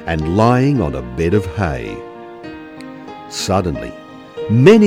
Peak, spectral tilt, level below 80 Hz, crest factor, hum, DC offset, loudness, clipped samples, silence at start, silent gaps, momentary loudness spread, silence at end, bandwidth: 0 dBFS; -6.5 dB/octave; -36 dBFS; 16 dB; none; under 0.1%; -16 LUFS; under 0.1%; 0 s; none; 20 LU; 0 s; 16 kHz